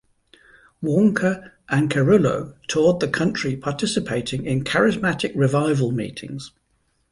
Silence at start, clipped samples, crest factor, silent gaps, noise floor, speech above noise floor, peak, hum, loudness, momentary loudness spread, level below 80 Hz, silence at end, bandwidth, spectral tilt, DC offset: 0.8 s; under 0.1%; 16 dB; none; -67 dBFS; 47 dB; -4 dBFS; none; -21 LUFS; 12 LU; -52 dBFS; 0.65 s; 11.5 kHz; -6 dB/octave; under 0.1%